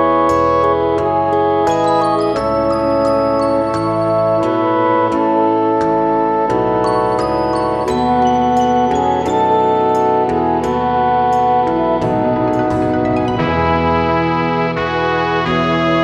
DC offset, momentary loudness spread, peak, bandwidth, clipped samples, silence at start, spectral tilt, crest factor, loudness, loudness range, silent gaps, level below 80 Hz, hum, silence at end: under 0.1%; 3 LU; 0 dBFS; 11.5 kHz; under 0.1%; 0 s; -7 dB/octave; 14 dB; -15 LUFS; 1 LU; none; -38 dBFS; none; 0 s